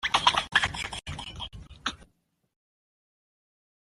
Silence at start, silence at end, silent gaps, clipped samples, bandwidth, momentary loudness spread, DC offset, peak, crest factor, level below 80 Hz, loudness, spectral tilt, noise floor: 0 s; 1.95 s; none; under 0.1%; 13.5 kHz; 16 LU; under 0.1%; -6 dBFS; 28 dB; -52 dBFS; -28 LUFS; -1.5 dB/octave; -68 dBFS